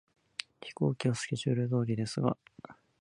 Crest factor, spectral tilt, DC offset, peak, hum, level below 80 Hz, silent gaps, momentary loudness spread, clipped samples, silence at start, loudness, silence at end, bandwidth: 22 dB; -6 dB/octave; under 0.1%; -12 dBFS; none; -68 dBFS; none; 19 LU; under 0.1%; 0.6 s; -33 LUFS; 0.3 s; 11 kHz